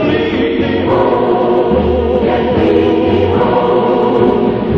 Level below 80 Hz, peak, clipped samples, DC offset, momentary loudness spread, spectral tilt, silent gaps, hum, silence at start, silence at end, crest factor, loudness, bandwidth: -30 dBFS; 0 dBFS; under 0.1%; under 0.1%; 3 LU; -9 dB/octave; none; none; 0 s; 0 s; 10 dB; -12 LUFS; 6 kHz